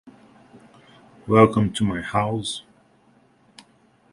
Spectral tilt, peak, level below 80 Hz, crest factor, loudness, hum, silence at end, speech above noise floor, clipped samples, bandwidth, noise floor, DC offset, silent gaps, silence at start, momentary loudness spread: -6 dB/octave; 0 dBFS; -52 dBFS; 24 dB; -21 LUFS; none; 1.5 s; 39 dB; under 0.1%; 11.5 kHz; -58 dBFS; under 0.1%; none; 0.05 s; 16 LU